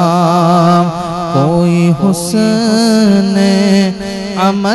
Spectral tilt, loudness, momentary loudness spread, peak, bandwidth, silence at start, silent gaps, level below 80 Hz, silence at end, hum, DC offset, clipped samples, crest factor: -6 dB/octave; -11 LUFS; 7 LU; 0 dBFS; 12.5 kHz; 0 s; none; -42 dBFS; 0 s; none; under 0.1%; 0.3%; 10 dB